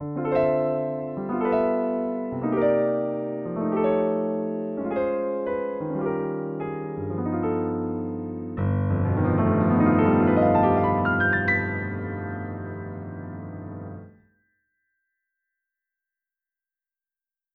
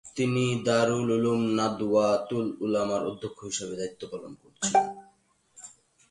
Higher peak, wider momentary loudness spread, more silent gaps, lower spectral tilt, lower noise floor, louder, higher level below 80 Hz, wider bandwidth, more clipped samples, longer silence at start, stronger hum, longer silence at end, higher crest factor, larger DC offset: about the same, -8 dBFS vs -10 dBFS; second, 15 LU vs 21 LU; neither; first, -8 dB/octave vs -5 dB/octave; first, under -90 dBFS vs -65 dBFS; first, -24 LUFS vs -27 LUFS; first, -54 dBFS vs -64 dBFS; second, 4.3 kHz vs 11.5 kHz; neither; about the same, 0 s vs 0.05 s; neither; first, 3.45 s vs 0.4 s; about the same, 16 dB vs 18 dB; neither